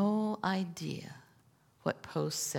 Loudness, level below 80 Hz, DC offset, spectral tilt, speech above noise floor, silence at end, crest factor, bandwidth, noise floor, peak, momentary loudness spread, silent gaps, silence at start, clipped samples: -36 LUFS; -76 dBFS; under 0.1%; -4.5 dB/octave; 31 dB; 0 s; 20 dB; 18 kHz; -66 dBFS; -16 dBFS; 13 LU; none; 0 s; under 0.1%